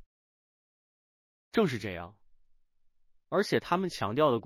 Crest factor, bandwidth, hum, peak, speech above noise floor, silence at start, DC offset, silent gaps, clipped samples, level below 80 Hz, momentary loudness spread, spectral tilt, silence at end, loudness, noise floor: 20 dB; 16 kHz; none; -12 dBFS; 36 dB; 1.55 s; under 0.1%; none; under 0.1%; -64 dBFS; 12 LU; -6 dB/octave; 0.05 s; -30 LUFS; -65 dBFS